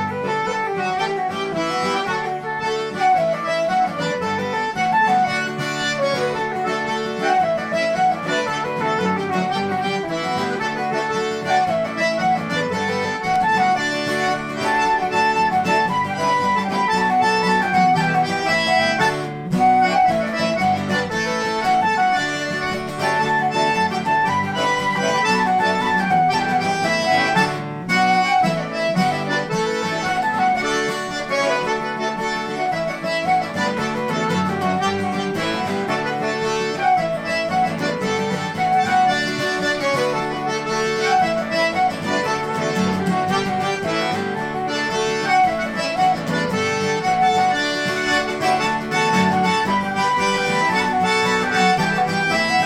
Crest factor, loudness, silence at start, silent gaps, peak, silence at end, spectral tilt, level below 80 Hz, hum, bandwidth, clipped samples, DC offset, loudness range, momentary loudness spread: 16 dB; -19 LUFS; 0 s; none; -4 dBFS; 0 s; -4.5 dB/octave; -52 dBFS; none; 15 kHz; under 0.1%; under 0.1%; 3 LU; 6 LU